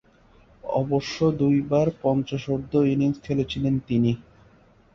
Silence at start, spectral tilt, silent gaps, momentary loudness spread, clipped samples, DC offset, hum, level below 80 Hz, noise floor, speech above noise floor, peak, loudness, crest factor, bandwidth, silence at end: 0.65 s; -8 dB/octave; none; 7 LU; under 0.1%; under 0.1%; none; -52 dBFS; -56 dBFS; 33 dB; -8 dBFS; -24 LUFS; 16 dB; 7 kHz; 0.75 s